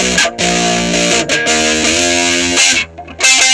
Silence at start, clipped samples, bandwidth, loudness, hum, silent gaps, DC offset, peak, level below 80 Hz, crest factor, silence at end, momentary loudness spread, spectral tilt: 0 s; under 0.1%; 11 kHz; -10 LUFS; none; none; under 0.1%; 0 dBFS; -38 dBFS; 12 dB; 0 s; 3 LU; -1.5 dB/octave